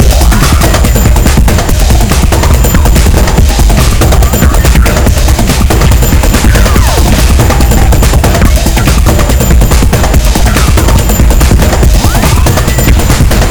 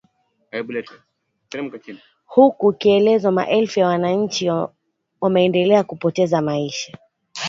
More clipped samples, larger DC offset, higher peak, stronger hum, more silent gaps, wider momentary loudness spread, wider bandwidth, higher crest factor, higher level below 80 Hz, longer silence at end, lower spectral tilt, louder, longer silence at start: first, 10% vs under 0.1%; neither; about the same, 0 dBFS vs -2 dBFS; neither; neither; second, 1 LU vs 15 LU; first, over 20 kHz vs 7.6 kHz; second, 4 dB vs 18 dB; first, -6 dBFS vs -64 dBFS; about the same, 0 s vs 0 s; about the same, -5 dB/octave vs -5.5 dB/octave; first, -7 LUFS vs -18 LUFS; second, 0 s vs 0.55 s